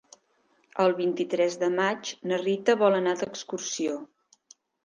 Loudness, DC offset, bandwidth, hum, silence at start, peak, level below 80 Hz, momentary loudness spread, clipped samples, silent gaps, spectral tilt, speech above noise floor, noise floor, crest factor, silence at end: -26 LUFS; under 0.1%; 10 kHz; none; 0.75 s; -8 dBFS; -78 dBFS; 11 LU; under 0.1%; none; -4 dB/octave; 42 dB; -68 dBFS; 20 dB; 0.8 s